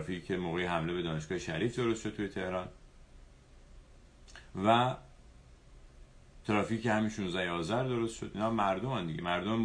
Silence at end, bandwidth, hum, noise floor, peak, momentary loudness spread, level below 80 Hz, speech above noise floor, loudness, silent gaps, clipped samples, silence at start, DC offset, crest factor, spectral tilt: 0 s; 10.5 kHz; none; -57 dBFS; -12 dBFS; 9 LU; -56 dBFS; 24 dB; -33 LUFS; none; under 0.1%; 0 s; under 0.1%; 22 dB; -6 dB/octave